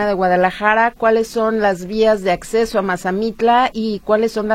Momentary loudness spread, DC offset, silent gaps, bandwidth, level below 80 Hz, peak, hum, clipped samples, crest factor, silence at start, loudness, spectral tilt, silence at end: 4 LU; under 0.1%; none; 15 kHz; -44 dBFS; 0 dBFS; none; under 0.1%; 16 dB; 0 s; -16 LUFS; -5 dB/octave; 0 s